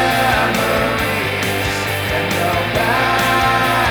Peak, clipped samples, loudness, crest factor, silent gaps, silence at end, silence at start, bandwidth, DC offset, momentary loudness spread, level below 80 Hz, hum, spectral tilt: -4 dBFS; under 0.1%; -16 LUFS; 14 dB; none; 0 s; 0 s; over 20 kHz; under 0.1%; 4 LU; -34 dBFS; none; -4 dB/octave